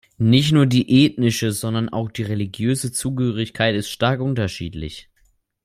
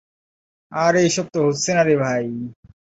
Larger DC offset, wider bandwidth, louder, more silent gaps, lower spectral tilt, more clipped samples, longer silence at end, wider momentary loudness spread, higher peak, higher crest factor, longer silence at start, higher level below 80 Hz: neither; first, 15.5 kHz vs 8 kHz; about the same, -20 LUFS vs -19 LUFS; neither; about the same, -5.5 dB/octave vs -4.5 dB/octave; neither; first, 0.6 s vs 0.45 s; second, 11 LU vs 14 LU; about the same, -2 dBFS vs -4 dBFS; about the same, 18 dB vs 16 dB; second, 0.2 s vs 0.7 s; first, -50 dBFS vs -58 dBFS